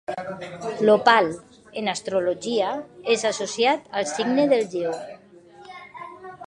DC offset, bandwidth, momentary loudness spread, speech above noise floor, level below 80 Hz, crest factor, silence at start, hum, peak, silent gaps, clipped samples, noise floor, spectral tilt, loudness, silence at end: under 0.1%; 11 kHz; 21 LU; 26 dB; -66 dBFS; 22 dB; 0.1 s; none; -2 dBFS; none; under 0.1%; -48 dBFS; -3.5 dB/octave; -23 LUFS; 0 s